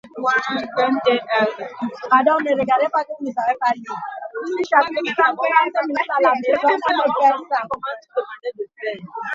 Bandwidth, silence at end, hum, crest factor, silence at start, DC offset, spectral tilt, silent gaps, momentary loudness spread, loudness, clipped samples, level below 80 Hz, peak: 7.6 kHz; 0 s; none; 18 dB; 0.05 s; under 0.1%; -4.5 dB/octave; none; 12 LU; -19 LUFS; under 0.1%; -66 dBFS; -2 dBFS